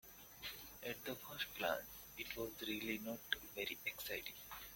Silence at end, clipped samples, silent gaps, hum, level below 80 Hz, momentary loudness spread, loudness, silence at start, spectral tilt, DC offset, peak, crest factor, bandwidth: 0 s; under 0.1%; none; none; -70 dBFS; 8 LU; -45 LUFS; 0.05 s; -2.5 dB/octave; under 0.1%; -18 dBFS; 28 dB; 17 kHz